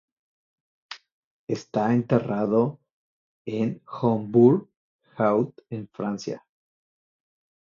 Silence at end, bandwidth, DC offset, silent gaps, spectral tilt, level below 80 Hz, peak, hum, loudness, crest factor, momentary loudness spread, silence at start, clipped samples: 1.3 s; 7.2 kHz; under 0.1%; 1.12-1.47 s, 2.91-3.45 s, 4.77-4.99 s; -8 dB/octave; -68 dBFS; -6 dBFS; none; -24 LUFS; 20 dB; 22 LU; 0.9 s; under 0.1%